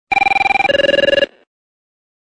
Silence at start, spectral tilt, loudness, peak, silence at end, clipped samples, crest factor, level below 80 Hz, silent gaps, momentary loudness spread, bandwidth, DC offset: 0.1 s; -3.5 dB/octave; -13 LUFS; -4 dBFS; 0.95 s; under 0.1%; 12 dB; -46 dBFS; none; 4 LU; 9.2 kHz; under 0.1%